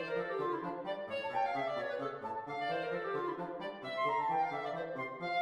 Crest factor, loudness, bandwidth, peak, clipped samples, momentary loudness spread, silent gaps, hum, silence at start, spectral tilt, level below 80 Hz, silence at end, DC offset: 14 dB; -37 LUFS; 12.5 kHz; -24 dBFS; under 0.1%; 7 LU; none; none; 0 s; -6 dB/octave; -76 dBFS; 0 s; under 0.1%